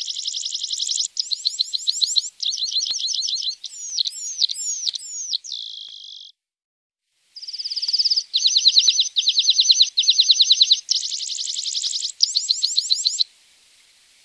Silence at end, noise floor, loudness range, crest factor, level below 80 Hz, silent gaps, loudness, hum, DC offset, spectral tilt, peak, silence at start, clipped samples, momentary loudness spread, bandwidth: 1 s; -55 dBFS; 11 LU; 20 dB; -84 dBFS; 6.64-6.90 s; -18 LUFS; none; under 0.1%; 7.5 dB/octave; -2 dBFS; 0 s; under 0.1%; 14 LU; 11 kHz